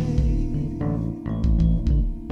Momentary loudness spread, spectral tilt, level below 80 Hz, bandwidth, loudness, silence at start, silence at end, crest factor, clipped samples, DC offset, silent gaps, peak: 6 LU; -9.5 dB/octave; -24 dBFS; 6.4 kHz; -24 LUFS; 0 s; 0 s; 14 dB; under 0.1%; under 0.1%; none; -8 dBFS